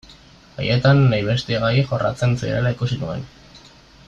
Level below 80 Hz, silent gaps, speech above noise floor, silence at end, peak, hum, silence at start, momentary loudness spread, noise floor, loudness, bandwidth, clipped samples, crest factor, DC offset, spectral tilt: -44 dBFS; none; 28 dB; 0.5 s; -4 dBFS; none; 0.1 s; 14 LU; -47 dBFS; -19 LUFS; 7.8 kHz; under 0.1%; 16 dB; under 0.1%; -7 dB/octave